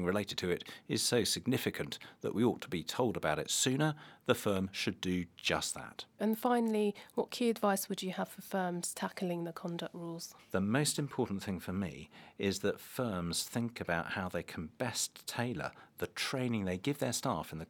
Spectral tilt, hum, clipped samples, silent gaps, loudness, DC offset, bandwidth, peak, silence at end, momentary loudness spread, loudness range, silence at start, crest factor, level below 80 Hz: -4 dB/octave; none; under 0.1%; none; -35 LUFS; under 0.1%; 19.5 kHz; -14 dBFS; 0.05 s; 10 LU; 3 LU; 0 s; 22 dB; -66 dBFS